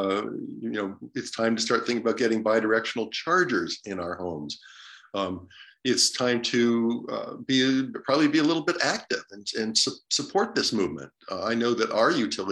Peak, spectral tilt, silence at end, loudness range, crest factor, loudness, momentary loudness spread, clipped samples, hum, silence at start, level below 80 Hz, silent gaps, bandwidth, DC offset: -8 dBFS; -3 dB/octave; 0 s; 3 LU; 18 dB; -26 LUFS; 12 LU; under 0.1%; none; 0 s; -72 dBFS; none; 13 kHz; under 0.1%